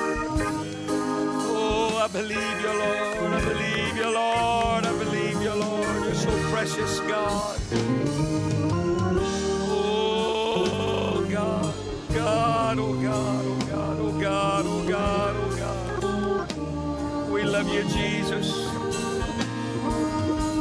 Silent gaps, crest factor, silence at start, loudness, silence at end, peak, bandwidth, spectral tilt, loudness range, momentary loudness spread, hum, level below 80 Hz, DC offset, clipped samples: none; 12 dB; 0 s; -26 LUFS; 0 s; -12 dBFS; 11 kHz; -5 dB/octave; 2 LU; 5 LU; none; -42 dBFS; under 0.1%; under 0.1%